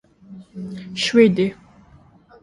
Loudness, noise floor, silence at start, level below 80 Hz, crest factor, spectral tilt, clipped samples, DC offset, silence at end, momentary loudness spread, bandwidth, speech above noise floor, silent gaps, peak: -18 LUFS; -50 dBFS; 0.3 s; -56 dBFS; 20 dB; -5.5 dB/octave; under 0.1%; under 0.1%; 0.9 s; 20 LU; 11.5 kHz; 32 dB; none; -2 dBFS